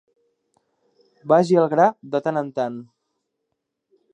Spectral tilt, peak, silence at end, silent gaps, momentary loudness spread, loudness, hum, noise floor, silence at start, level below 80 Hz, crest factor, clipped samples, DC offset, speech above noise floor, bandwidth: -7.5 dB/octave; -2 dBFS; 1.3 s; none; 14 LU; -20 LUFS; none; -78 dBFS; 1.25 s; -76 dBFS; 20 dB; under 0.1%; under 0.1%; 59 dB; 9.8 kHz